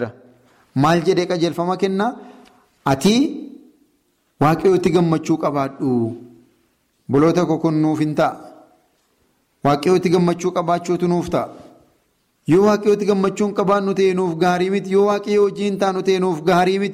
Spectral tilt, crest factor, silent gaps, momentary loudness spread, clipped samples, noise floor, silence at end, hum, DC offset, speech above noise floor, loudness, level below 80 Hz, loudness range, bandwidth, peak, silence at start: -6.5 dB/octave; 14 dB; none; 8 LU; under 0.1%; -64 dBFS; 0 s; none; under 0.1%; 47 dB; -18 LUFS; -54 dBFS; 3 LU; 15 kHz; -6 dBFS; 0 s